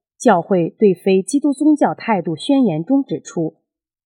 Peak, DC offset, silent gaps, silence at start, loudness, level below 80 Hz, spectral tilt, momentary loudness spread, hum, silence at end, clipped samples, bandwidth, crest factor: 0 dBFS; under 0.1%; none; 0.2 s; -17 LUFS; -74 dBFS; -6.5 dB/octave; 9 LU; none; 0.55 s; under 0.1%; 11.5 kHz; 16 dB